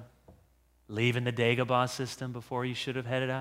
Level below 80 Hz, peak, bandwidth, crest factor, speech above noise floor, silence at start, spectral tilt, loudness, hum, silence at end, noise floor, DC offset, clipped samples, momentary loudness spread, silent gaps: -66 dBFS; -12 dBFS; 15.5 kHz; 20 dB; 35 dB; 0 s; -5.5 dB/octave; -31 LUFS; none; 0 s; -66 dBFS; under 0.1%; under 0.1%; 9 LU; none